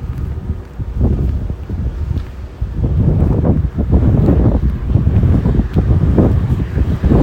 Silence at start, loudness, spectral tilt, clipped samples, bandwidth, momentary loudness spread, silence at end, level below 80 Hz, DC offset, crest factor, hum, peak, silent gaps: 0 s; -15 LUFS; -10.5 dB/octave; under 0.1%; 5 kHz; 11 LU; 0 s; -18 dBFS; under 0.1%; 14 dB; none; 0 dBFS; none